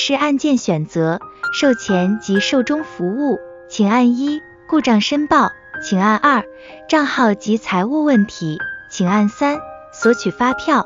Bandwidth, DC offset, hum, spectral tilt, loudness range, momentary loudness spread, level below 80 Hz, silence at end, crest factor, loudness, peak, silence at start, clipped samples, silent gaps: 7.6 kHz; under 0.1%; none; -5 dB/octave; 2 LU; 9 LU; -54 dBFS; 0 s; 16 dB; -17 LUFS; -2 dBFS; 0 s; under 0.1%; none